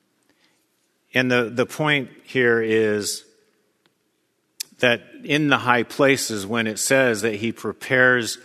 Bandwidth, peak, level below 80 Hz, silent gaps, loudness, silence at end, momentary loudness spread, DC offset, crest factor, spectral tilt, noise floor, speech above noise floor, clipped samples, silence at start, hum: 14 kHz; 0 dBFS; -68 dBFS; none; -20 LUFS; 0.1 s; 9 LU; under 0.1%; 22 dB; -4 dB/octave; -69 dBFS; 49 dB; under 0.1%; 1.15 s; none